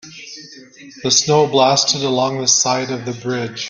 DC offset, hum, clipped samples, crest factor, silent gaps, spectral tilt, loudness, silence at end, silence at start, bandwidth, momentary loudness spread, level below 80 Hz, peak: under 0.1%; none; under 0.1%; 18 dB; none; -2.5 dB/octave; -15 LUFS; 0 s; 0.05 s; 11 kHz; 20 LU; -58 dBFS; 0 dBFS